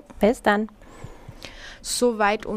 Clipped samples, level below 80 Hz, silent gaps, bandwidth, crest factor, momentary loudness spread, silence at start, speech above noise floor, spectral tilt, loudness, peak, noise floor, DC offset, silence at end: under 0.1%; -46 dBFS; none; 15.5 kHz; 20 dB; 23 LU; 0.1 s; 20 dB; -4 dB/octave; -22 LUFS; -4 dBFS; -42 dBFS; under 0.1%; 0 s